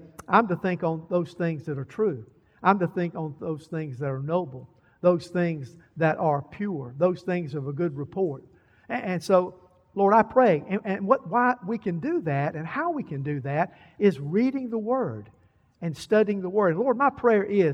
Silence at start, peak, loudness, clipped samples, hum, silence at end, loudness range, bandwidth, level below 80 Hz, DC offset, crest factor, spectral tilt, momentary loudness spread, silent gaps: 0 s; -4 dBFS; -26 LUFS; under 0.1%; none; 0 s; 5 LU; 12 kHz; -66 dBFS; under 0.1%; 20 dB; -8 dB/octave; 11 LU; none